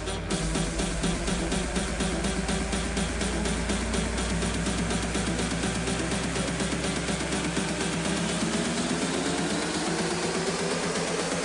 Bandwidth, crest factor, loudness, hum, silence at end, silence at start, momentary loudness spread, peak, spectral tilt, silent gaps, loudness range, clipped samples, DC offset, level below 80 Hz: 13 kHz; 12 dB; -28 LUFS; none; 0 s; 0 s; 1 LU; -16 dBFS; -4 dB/octave; none; 1 LU; under 0.1%; under 0.1%; -36 dBFS